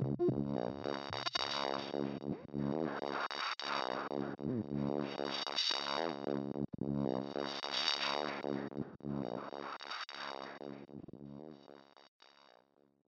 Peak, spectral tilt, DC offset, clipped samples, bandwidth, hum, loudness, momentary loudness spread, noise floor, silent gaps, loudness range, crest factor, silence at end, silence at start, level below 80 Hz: -16 dBFS; -5 dB/octave; under 0.1%; under 0.1%; 8.6 kHz; none; -38 LUFS; 14 LU; -70 dBFS; 12.08-12.20 s; 9 LU; 22 dB; 0.6 s; 0 s; -68 dBFS